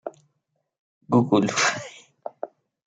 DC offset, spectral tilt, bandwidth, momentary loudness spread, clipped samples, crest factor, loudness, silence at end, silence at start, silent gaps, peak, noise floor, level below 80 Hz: under 0.1%; -4.5 dB/octave; 9.4 kHz; 21 LU; under 0.1%; 20 dB; -22 LUFS; 0.4 s; 0.05 s; 0.79-1.01 s; -6 dBFS; -76 dBFS; -70 dBFS